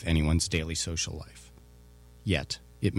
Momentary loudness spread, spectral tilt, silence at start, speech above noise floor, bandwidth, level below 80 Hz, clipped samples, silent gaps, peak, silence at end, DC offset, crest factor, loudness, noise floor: 17 LU; -4.5 dB/octave; 0 s; 24 dB; 14 kHz; -40 dBFS; under 0.1%; none; -12 dBFS; 0 s; under 0.1%; 20 dB; -30 LUFS; -53 dBFS